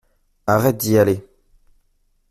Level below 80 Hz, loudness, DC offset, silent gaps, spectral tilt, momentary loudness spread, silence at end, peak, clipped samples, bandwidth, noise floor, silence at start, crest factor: -52 dBFS; -18 LUFS; under 0.1%; none; -6 dB/octave; 10 LU; 1.1 s; -4 dBFS; under 0.1%; 16 kHz; -63 dBFS; 0.45 s; 18 dB